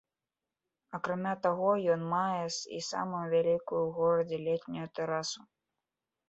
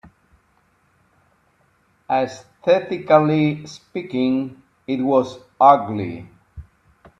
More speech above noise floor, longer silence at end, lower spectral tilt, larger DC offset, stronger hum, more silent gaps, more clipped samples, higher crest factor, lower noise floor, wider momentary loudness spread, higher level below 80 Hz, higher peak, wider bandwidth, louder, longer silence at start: first, over 58 dB vs 43 dB; first, 0.9 s vs 0.55 s; second, -5 dB/octave vs -7.5 dB/octave; neither; neither; neither; neither; about the same, 18 dB vs 22 dB; first, under -90 dBFS vs -61 dBFS; second, 9 LU vs 17 LU; second, -74 dBFS vs -56 dBFS; second, -16 dBFS vs 0 dBFS; about the same, 8.2 kHz vs 8.4 kHz; second, -32 LUFS vs -19 LUFS; second, 0.9 s vs 2.1 s